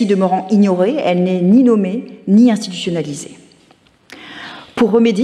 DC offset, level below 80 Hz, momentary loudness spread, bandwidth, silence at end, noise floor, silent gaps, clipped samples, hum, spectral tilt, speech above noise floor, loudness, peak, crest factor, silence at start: under 0.1%; -60 dBFS; 19 LU; 11 kHz; 0 s; -51 dBFS; none; under 0.1%; none; -7 dB/octave; 38 dB; -14 LUFS; -2 dBFS; 12 dB; 0 s